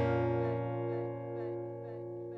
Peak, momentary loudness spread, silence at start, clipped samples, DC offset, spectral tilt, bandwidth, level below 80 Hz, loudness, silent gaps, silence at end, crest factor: -20 dBFS; 11 LU; 0 s; under 0.1%; under 0.1%; -10 dB/octave; 5.6 kHz; -62 dBFS; -37 LUFS; none; 0 s; 14 dB